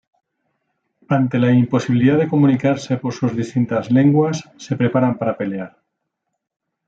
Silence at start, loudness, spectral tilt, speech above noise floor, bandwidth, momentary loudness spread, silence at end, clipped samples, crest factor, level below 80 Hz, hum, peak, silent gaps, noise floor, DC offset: 1.1 s; -17 LUFS; -8 dB/octave; 60 dB; 7.8 kHz; 10 LU; 1.2 s; under 0.1%; 16 dB; -62 dBFS; none; -4 dBFS; none; -76 dBFS; under 0.1%